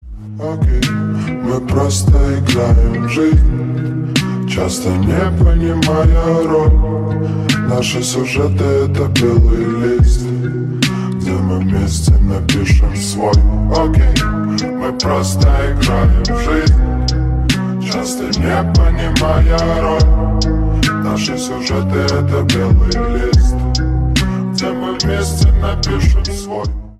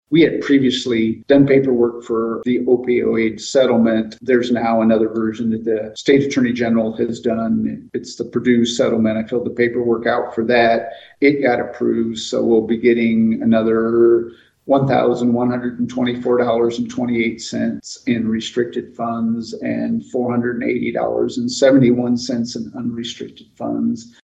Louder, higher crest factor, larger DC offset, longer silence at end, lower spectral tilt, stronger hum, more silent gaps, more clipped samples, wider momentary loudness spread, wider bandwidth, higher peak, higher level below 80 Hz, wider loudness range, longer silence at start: first, -14 LUFS vs -17 LUFS; about the same, 12 dB vs 16 dB; neither; second, 0.05 s vs 0.2 s; about the same, -6 dB/octave vs -6 dB/octave; neither; neither; neither; second, 6 LU vs 9 LU; first, 13.5 kHz vs 8.4 kHz; about the same, 0 dBFS vs -2 dBFS; first, -16 dBFS vs -54 dBFS; second, 1 LU vs 5 LU; about the same, 0.05 s vs 0.1 s